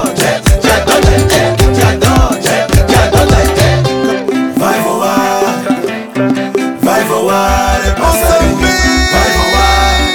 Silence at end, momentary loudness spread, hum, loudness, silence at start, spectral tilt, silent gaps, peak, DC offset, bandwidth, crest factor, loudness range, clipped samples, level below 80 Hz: 0 s; 5 LU; none; -10 LUFS; 0 s; -4.5 dB/octave; none; 0 dBFS; under 0.1%; over 20 kHz; 10 dB; 3 LU; under 0.1%; -18 dBFS